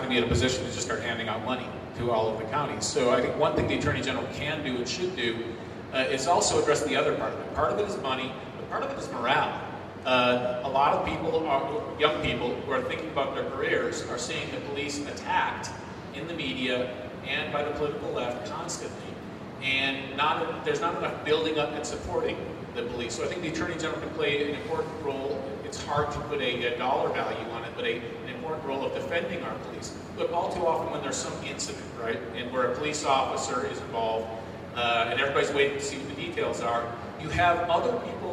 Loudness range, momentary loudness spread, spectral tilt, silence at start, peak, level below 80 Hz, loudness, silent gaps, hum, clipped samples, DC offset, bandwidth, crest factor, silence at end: 4 LU; 10 LU; -4 dB/octave; 0 s; -8 dBFS; -52 dBFS; -29 LUFS; none; none; under 0.1%; under 0.1%; 13.5 kHz; 22 dB; 0 s